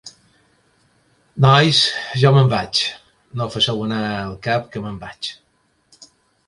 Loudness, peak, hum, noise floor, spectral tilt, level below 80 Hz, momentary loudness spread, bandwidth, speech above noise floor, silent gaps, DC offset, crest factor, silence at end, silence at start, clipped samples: -17 LUFS; 0 dBFS; none; -63 dBFS; -5 dB/octave; -52 dBFS; 17 LU; 11.5 kHz; 46 dB; none; under 0.1%; 20 dB; 1.15 s; 0.05 s; under 0.1%